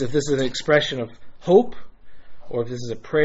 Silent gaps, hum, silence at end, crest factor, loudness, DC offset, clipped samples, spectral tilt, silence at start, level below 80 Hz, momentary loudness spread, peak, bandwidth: none; none; 0 s; 18 dB; -22 LUFS; under 0.1%; under 0.1%; -4 dB/octave; 0 s; -50 dBFS; 14 LU; -2 dBFS; 8 kHz